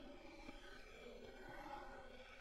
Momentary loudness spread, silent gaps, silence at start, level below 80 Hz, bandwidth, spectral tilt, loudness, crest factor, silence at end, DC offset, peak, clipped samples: 5 LU; none; 0 s; -64 dBFS; 14 kHz; -4.5 dB/octave; -57 LUFS; 14 dB; 0 s; under 0.1%; -42 dBFS; under 0.1%